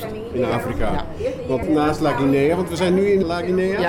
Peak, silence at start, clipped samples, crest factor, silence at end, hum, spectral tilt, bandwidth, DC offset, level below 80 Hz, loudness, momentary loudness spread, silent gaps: -8 dBFS; 0 s; under 0.1%; 10 dB; 0 s; none; -6.5 dB/octave; 17 kHz; under 0.1%; -36 dBFS; -20 LUFS; 8 LU; none